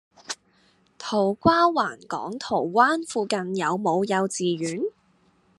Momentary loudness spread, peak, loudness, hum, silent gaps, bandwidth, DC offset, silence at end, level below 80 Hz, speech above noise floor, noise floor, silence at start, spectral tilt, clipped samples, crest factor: 14 LU; -4 dBFS; -24 LUFS; none; none; 12 kHz; under 0.1%; 0.7 s; -62 dBFS; 39 dB; -63 dBFS; 0.3 s; -4.5 dB/octave; under 0.1%; 22 dB